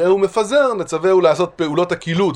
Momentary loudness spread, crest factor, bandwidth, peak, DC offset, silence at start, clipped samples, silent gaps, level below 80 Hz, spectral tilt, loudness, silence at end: 5 LU; 14 dB; 11 kHz; -2 dBFS; under 0.1%; 0 s; under 0.1%; none; -54 dBFS; -5.5 dB/octave; -16 LUFS; 0 s